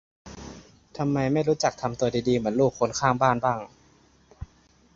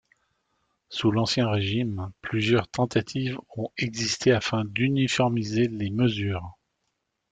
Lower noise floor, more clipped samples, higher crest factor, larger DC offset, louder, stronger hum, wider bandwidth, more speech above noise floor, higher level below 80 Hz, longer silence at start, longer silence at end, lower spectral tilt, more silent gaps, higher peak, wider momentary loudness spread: second, -59 dBFS vs -78 dBFS; neither; about the same, 22 dB vs 20 dB; neither; about the same, -25 LUFS vs -26 LUFS; neither; second, 7.8 kHz vs 9.4 kHz; second, 35 dB vs 53 dB; first, -52 dBFS vs -58 dBFS; second, 0.25 s vs 0.9 s; second, 0.5 s vs 0.8 s; about the same, -5.5 dB/octave vs -5.5 dB/octave; neither; about the same, -6 dBFS vs -8 dBFS; first, 23 LU vs 9 LU